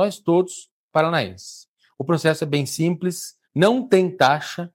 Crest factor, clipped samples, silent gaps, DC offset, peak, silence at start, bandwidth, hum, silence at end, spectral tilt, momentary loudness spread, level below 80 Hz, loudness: 18 dB; under 0.1%; 0.71-0.89 s, 1.68-1.76 s; under 0.1%; -4 dBFS; 0 s; 16.5 kHz; none; 0.05 s; -5.5 dB/octave; 14 LU; -66 dBFS; -21 LUFS